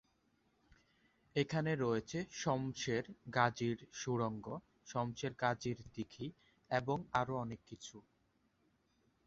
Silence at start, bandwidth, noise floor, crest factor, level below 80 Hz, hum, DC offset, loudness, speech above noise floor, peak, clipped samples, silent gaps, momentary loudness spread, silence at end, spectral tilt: 1.35 s; 7.6 kHz; -77 dBFS; 24 dB; -70 dBFS; none; under 0.1%; -39 LUFS; 38 dB; -16 dBFS; under 0.1%; none; 13 LU; 1.25 s; -5 dB/octave